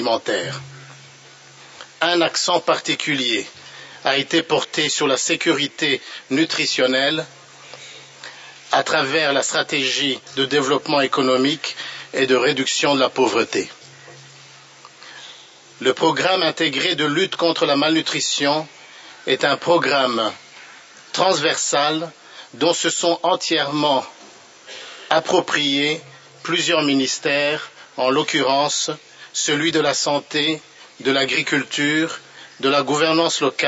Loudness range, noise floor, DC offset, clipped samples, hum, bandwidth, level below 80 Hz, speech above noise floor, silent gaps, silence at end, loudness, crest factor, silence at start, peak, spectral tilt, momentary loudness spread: 3 LU; -45 dBFS; under 0.1%; under 0.1%; none; 8.2 kHz; -72 dBFS; 26 dB; none; 0 s; -19 LUFS; 20 dB; 0 s; 0 dBFS; -2.5 dB/octave; 19 LU